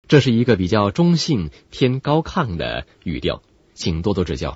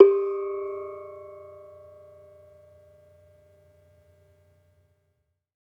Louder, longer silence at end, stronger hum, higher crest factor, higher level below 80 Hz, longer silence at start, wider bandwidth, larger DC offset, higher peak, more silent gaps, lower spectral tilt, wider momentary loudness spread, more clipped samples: first, -20 LUFS vs -27 LUFS; second, 0 s vs 4.2 s; neither; second, 18 dB vs 26 dB; first, -38 dBFS vs -78 dBFS; about the same, 0.1 s vs 0 s; first, 8 kHz vs 2.7 kHz; neither; about the same, 0 dBFS vs -2 dBFS; neither; second, -6.5 dB/octave vs -9 dB/octave; second, 10 LU vs 24 LU; neither